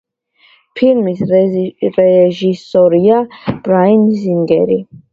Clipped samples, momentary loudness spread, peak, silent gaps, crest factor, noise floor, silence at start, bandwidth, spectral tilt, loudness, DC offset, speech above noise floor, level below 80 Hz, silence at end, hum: under 0.1%; 8 LU; 0 dBFS; none; 12 dB; -51 dBFS; 0.75 s; 7.2 kHz; -9 dB/octave; -12 LUFS; under 0.1%; 40 dB; -52 dBFS; 0.15 s; none